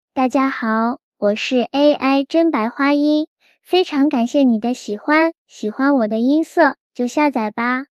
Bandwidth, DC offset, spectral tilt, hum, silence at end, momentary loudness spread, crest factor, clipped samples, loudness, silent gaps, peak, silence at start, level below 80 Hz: 12.5 kHz; under 0.1%; -5 dB/octave; none; 0.1 s; 7 LU; 16 dB; under 0.1%; -17 LUFS; 1.03-1.12 s, 3.27-3.36 s, 5.38-5.46 s, 6.80-6.90 s; -2 dBFS; 0.15 s; -68 dBFS